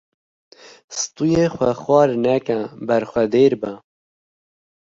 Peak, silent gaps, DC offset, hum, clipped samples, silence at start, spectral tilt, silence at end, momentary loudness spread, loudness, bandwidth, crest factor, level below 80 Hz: -2 dBFS; none; under 0.1%; none; under 0.1%; 0.9 s; -5.5 dB/octave; 1.1 s; 11 LU; -19 LUFS; 7.8 kHz; 18 dB; -54 dBFS